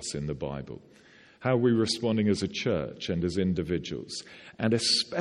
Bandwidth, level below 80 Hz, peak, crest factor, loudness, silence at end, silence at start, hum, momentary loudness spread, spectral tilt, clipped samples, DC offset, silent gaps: 12 kHz; -54 dBFS; -12 dBFS; 18 dB; -28 LUFS; 0 s; 0 s; none; 14 LU; -5 dB/octave; under 0.1%; under 0.1%; none